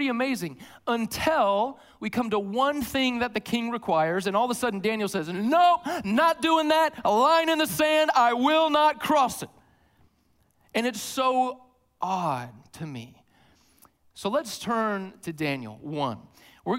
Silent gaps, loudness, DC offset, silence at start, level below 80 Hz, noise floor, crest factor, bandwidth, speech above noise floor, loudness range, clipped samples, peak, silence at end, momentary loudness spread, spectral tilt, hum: none; -25 LUFS; under 0.1%; 0 s; -62 dBFS; -66 dBFS; 16 dB; 16 kHz; 41 dB; 10 LU; under 0.1%; -10 dBFS; 0 s; 15 LU; -4 dB/octave; none